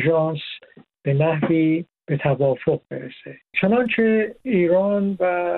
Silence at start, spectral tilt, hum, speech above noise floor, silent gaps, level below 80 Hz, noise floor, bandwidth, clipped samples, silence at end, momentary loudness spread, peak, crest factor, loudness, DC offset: 0 s; -10 dB/octave; none; 28 dB; none; -60 dBFS; -48 dBFS; 4.3 kHz; under 0.1%; 0 s; 15 LU; -4 dBFS; 16 dB; -21 LUFS; under 0.1%